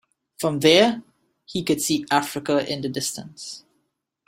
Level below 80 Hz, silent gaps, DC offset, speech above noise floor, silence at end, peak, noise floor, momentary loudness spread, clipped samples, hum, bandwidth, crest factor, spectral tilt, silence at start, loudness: -62 dBFS; none; under 0.1%; 52 dB; 0.7 s; -2 dBFS; -74 dBFS; 19 LU; under 0.1%; none; 16.5 kHz; 22 dB; -3.5 dB/octave; 0.4 s; -21 LUFS